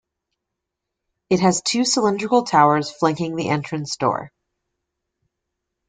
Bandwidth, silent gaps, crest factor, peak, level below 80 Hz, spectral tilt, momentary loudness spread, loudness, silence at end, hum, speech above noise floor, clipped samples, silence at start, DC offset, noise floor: 9.6 kHz; none; 20 dB; -2 dBFS; -62 dBFS; -4.5 dB/octave; 8 LU; -19 LUFS; 1.6 s; none; 63 dB; under 0.1%; 1.3 s; under 0.1%; -82 dBFS